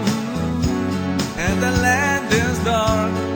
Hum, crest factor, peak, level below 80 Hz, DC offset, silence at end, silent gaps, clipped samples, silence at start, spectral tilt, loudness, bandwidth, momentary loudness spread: none; 16 dB; -4 dBFS; -34 dBFS; under 0.1%; 0 s; none; under 0.1%; 0 s; -5 dB/octave; -19 LUFS; over 20 kHz; 5 LU